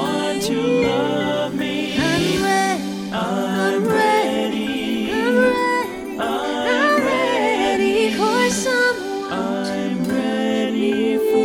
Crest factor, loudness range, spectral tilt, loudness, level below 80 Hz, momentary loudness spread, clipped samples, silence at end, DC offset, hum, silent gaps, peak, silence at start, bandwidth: 16 dB; 2 LU; -4.5 dB/octave; -19 LUFS; -50 dBFS; 6 LU; under 0.1%; 0 s; under 0.1%; none; none; -4 dBFS; 0 s; 18 kHz